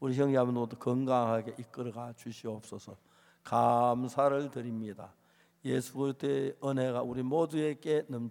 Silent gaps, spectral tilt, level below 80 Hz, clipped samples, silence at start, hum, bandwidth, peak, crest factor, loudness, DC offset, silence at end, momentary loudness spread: none; -7 dB/octave; -76 dBFS; under 0.1%; 0 s; none; 17 kHz; -14 dBFS; 18 dB; -32 LUFS; under 0.1%; 0 s; 15 LU